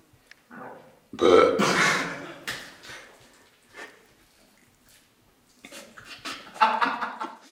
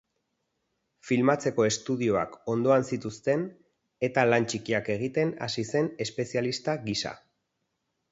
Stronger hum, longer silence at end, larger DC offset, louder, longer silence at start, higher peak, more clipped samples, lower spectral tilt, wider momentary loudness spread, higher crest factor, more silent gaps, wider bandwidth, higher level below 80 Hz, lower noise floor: neither; second, 0.15 s vs 0.95 s; neither; first, -24 LUFS vs -28 LUFS; second, 0.5 s vs 1.05 s; first, -4 dBFS vs -8 dBFS; neither; second, -3.5 dB/octave vs -5 dB/octave; first, 26 LU vs 8 LU; about the same, 24 dB vs 22 dB; neither; first, 16.5 kHz vs 8 kHz; about the same, -68 dBFS vs -64 dBFS; second, -62 dBFS vs -80 dBFS